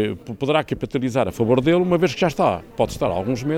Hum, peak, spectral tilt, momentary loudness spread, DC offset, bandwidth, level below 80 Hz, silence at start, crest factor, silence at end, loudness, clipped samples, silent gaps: none; -4 dBFS; -6.5 dB/octave; 7 LU; under 0.1%; 16.5 kHz; -46 dBFS; 0 s; 16 dB; 0 s; -21 LUFS; under 0.1%; none